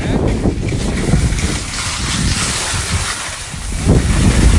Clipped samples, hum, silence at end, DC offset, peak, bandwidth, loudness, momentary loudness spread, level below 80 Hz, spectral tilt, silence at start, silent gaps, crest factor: under 0.1%; none; 0 s; under 0.1%; 0 dBFS; 11.5 kHz; -16 LUFS; 6 LU; -20 dBFS; -4.5 dB/octave; 0 s; none; 14 dB